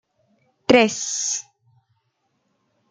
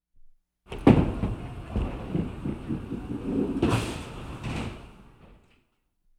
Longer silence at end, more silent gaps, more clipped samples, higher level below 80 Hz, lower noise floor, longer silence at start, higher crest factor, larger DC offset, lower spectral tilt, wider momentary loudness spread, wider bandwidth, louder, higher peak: first, 1.5 s vs 0.85 s; neither; neither; second, -64 dBFS vs -40 dBFS; about the same, -71 dBFS vs -70 dBFS; first, 0.7 s vs 0.2 s; about the same, 22 dB vs 26 dB; neither; second, -2.5 dB/octave vs -7.5 dB/octave; second, 12 LU vs 17 LU; second, 10 kHz vs 13.5 kHz; first, -19 LUFS vs -28 LUFS; about the same, -2 dBFS vs -4 dBFS